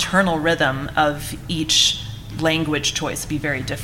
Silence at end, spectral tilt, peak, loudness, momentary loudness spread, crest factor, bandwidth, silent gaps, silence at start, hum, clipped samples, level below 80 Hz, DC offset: 0 s; -3 dB/octave; -4 dBFS; -20 LUFS; 11 LU; 18 dB; 17 kHz; none; 0 s; none; under 0.1%; -40 dBFS; under 0.1%